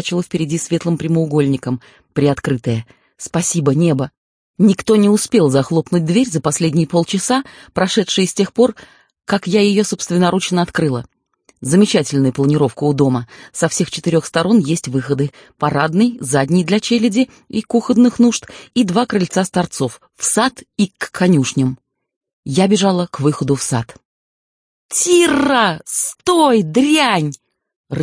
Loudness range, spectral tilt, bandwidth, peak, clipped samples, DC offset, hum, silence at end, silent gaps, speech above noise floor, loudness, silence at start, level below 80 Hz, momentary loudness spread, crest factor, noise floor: 3 LU; -5 dB/octave; 10.5 kHz; -2 dBFS; under 0.1%; under 0.1%; none; 0 s; 4.17-4.54 s, 22.16-22.21 s, 22.33-22.43 s, 24.05-24.89 s, 27.76-27.84 s; over 75 dB; -16 LUFS; 0 s; -52 dBFS; 9 LU; 14 dB; under -90 dBFS